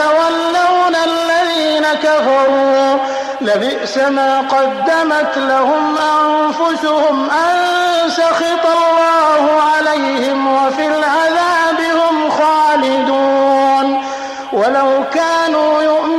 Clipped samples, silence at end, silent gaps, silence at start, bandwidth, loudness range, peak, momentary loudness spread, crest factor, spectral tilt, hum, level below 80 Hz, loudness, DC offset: under 0.1%; 0 s; none; 0 s; 13.5 kHz; 1 LU; -2 dBFS; 4 LU; 10 dB; -3 dB/octave; none; -58 dBFS; -13 LUFS; under 0.1%